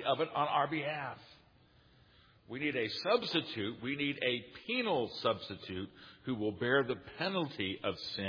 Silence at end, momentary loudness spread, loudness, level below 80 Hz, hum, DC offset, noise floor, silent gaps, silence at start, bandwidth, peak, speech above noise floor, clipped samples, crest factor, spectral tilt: 0 s; 11 LU; -35 LUFS; -72 dBFS; none; under 0.1%; -65 dBFS; none; 0 s; 5.4 kHz; -16 dBFS; 29 dB; under 0.1%; 20 dB; -6 dB/octave